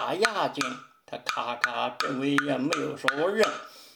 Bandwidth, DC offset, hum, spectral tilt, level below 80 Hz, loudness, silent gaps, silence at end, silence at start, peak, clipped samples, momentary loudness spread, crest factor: over 20 kHz; under 0.1%; none; -3.5 dB/octave; -74 dBFS; -27 LUFS; none; 0.05 s; 0 s; -4 dBFS; under 0.1%; 8 LU; 24 dB